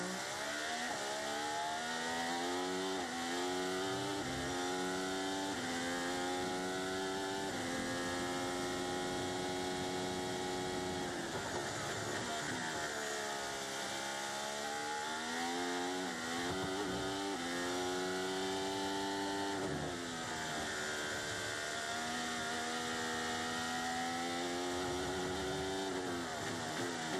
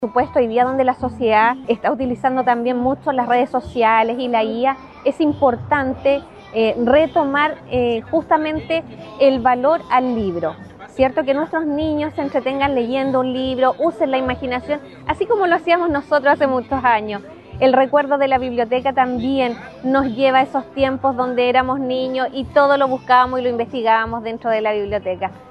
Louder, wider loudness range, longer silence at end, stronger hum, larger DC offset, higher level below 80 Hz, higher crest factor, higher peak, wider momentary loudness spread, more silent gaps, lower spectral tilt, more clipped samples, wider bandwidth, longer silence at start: second, -38 LUFS vs -18 LUFS; about the same, 1 LU vs 2 LU; about the same, 0 s vs 0 s; neither; neither; second, -66 dBFS vs -46 dBFS; about the same, 12 dB vs 16 dB; second, -26 dBFS vs -2 dBFS; second, 2 LU vs 8 LU; neither; second, -3 dB/octave vs -7 dB/octave; neither; first, 16 kHz vs 8.8 kHz; about the same, 0 s vs 0 s